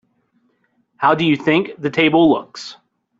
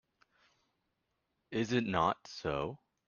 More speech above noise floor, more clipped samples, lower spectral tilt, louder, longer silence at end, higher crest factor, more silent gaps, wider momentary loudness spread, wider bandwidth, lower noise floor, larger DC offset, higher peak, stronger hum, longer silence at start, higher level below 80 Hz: about the same, 48 dB vs 49 dB; neither; about the same, -6 dB/octave vs -6 dB/octave; first, -16 LUFS vs -35 LUFS; first, 0.45 s vs 0.3 s; about the same, 18 dB vs 22 dB; neither; first, 19 LU vs 9 LU; about the same, 7.6 kHz vs 7.4 kHz; second, -64 dBFS vs -83 dBFS; neither; first, 0 dBFS vs -16 dBFS; neither; second, 1 s vs 1.5 s; about the same, -60 dBFS vs -64 dBFS